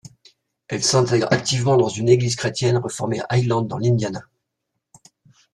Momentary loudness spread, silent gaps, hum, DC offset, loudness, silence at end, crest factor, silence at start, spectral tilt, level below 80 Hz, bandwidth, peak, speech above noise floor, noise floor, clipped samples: 8 LU; none; none; under 0.1%; -20 LUFS; 1.35 s; 18 dB; 0.7 s; -5 dB/octave; -54 dBFS; 12 kHz; -2 dBFS; 59 dB; -78 dBFS; under 0.1%